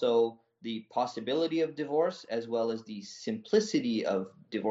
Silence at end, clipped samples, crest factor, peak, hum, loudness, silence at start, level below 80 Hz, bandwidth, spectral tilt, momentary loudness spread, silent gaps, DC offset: 0 s; under 0.1%; 18 dB; -12 dBFS; none; -32 LUFS; 0 s; -78 dBFS; 8 kHz; -4 dB/octave; 11 LU; none; under 0.1%